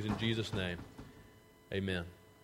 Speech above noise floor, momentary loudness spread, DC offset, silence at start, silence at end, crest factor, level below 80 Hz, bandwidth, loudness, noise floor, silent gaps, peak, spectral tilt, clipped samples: 24 dB; 20 LU; under 0.1%; 0 s; 0.1 s; 20 dB; -58 dBFS; 16 kHz; -38 LUFS; -61 dBFS; none; -20 dBFS; -6 dB/octave; under 0.1%